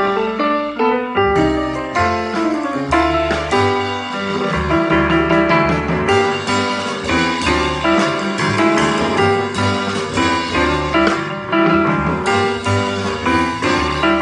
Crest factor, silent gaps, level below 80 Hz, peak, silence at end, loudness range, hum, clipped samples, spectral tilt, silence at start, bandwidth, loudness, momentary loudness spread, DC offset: 16 dB; none; -34 dBFS; 0 dBFS; 0 s; 1 LU; none; under 0.1%; -5 dB/octave; 0 s; 10.5 kHz; -16 LUFS; 5 LU; under 0.1%